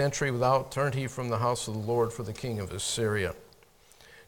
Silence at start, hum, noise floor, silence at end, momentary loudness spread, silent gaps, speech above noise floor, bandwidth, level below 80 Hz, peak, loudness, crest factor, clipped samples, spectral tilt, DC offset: 0 s; none; -59 dBFS; 0.05 s; 9 LU; none; 30 dB; 18 kHz; -56 dBFS; -12 dBFS; -30 LUFS; 18 dB; under 0.1%; -4.5 dB/octave; under 0.1%